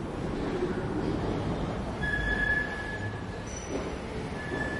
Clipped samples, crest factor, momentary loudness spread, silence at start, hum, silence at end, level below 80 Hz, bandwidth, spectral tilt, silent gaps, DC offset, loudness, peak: under 0.1%; 14 dB; 8 LU; 0 s; none; 0 s; -42 dBFS; 11.5 kHz; -5.5 dB/octave; none; under 0.1%; -32 LUFS; -18 dBFS